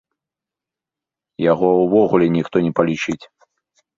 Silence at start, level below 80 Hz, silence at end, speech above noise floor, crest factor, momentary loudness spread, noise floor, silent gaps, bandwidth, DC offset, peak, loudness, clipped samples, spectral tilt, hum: 1.4 s; -56 dBFS; 0.7 s; 71 dB; 20 dB; 9 LU; -87 dBFS; none; 7.4 kHz; under 0.1%; 0 dBFS; -17 LUFS; under 0.1%; -7 dB/octave; none